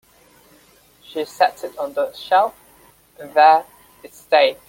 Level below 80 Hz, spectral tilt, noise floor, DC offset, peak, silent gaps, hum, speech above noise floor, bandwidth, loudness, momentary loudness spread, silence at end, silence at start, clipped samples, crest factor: -64 dBFS; -2.5 dB/octave; -53 dBFS; under 0.1%; -2 dBFS; none; none; 35 dB; 17 kHz; -18 LUFS; 15 LU; 0.15 s; 1.15 s; under 0.1%; 18 dB